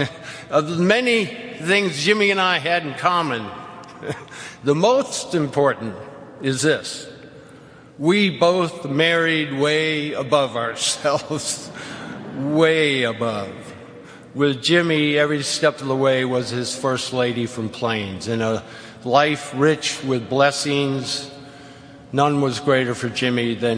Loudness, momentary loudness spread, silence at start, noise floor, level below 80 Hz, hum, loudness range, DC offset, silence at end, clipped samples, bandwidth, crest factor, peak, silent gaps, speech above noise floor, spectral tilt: -20 LUFS; 16 LU; 0 s; -44 dBFS; -60 dBFS; none; 3 LU; under 0.1%; 0 s; under 0.1%; 10.5 kHz; 20 dB; -2 dBFS; none; 24 dB; -4.5 dB/octave